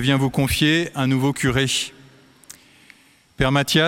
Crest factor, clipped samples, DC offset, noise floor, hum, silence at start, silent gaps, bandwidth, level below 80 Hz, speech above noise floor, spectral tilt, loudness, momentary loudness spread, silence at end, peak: 20 dB; under 0.1%; under 0.1%; -52 dBFS; none; 0 s; none; 17 kHz; -42 dBFS; 33 dB; -4.5 dB/octave; -20 LUFS; 6 LU; 0 s; -2 dBFS